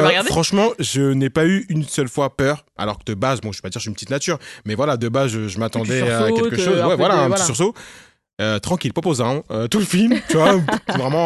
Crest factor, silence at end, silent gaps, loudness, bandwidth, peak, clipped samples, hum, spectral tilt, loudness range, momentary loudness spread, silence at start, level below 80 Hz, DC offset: 16 dB; 0 s; 8.33-8.37 s; -19 LUFS; 12.5 kHz; -2 dBFS; under 0.1%; none; -5 dB/octave; 4 LU; 9 LU; 0 s; -48 dBFS; under 0.1%